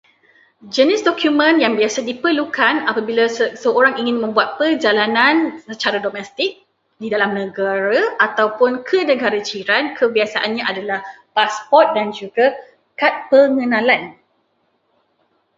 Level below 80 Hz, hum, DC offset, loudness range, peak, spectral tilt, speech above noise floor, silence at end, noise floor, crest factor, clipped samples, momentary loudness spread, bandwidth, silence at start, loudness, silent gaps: -68 dBFS; none; under 0.1%; 2 LU; 0 dBFS; -3.5 dB/octave; 48 dB; 1.45 s; -65 dBFS; 18 dB; under 0.1%; 9 LU; 7.8 kHz; 0.65 s; -16 LUFS; none